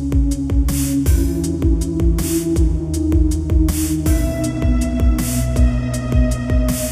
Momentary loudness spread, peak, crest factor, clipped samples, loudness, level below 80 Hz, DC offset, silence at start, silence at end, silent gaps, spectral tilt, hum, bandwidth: 2 LU; -4 dBFS; 12 dB; under 0.1%; -18 LUFS; -18 dBFS; under 0.1%; 0 s; 0 s; none; -6.5 dB/octave; none; 15.5 kHz